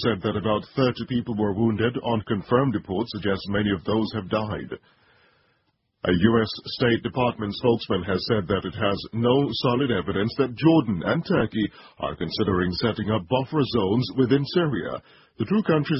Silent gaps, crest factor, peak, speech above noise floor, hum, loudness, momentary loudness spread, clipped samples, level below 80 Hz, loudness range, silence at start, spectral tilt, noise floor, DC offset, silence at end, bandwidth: none; 20 dB; -4 dBFS; 47 dB; none; -24 LUFS; 7 LU; under 0.1%; -48 dBFS; 3 LU; 0 s; -10.5 dB/octave; -71 dBFS; under 0.1%; 0 s; 5.8 kHz